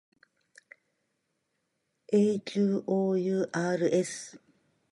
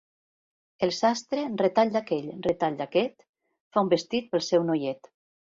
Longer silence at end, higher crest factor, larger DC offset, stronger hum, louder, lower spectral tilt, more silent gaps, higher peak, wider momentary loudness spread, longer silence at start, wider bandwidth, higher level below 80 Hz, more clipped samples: about the same, 0.55 s vs 0.65 s; about the same, 18 dB vs 18 dB; neither; neither; about the same, -28 LUFS vs -27 LUFS; about the same, -6 dB/octave vs -5 dB/octave; second, none vs 3.29-3.33 s, 3.60-3.71 s; second, -14 dBFS vs -8 dBFS; about the same, 8 LU vs 6 LU; first, 2.1 s vs 0.8 s; first, 11.5 kHz vs 7.8 kHz; second, -80 dBFS vs -68 dBFS; neither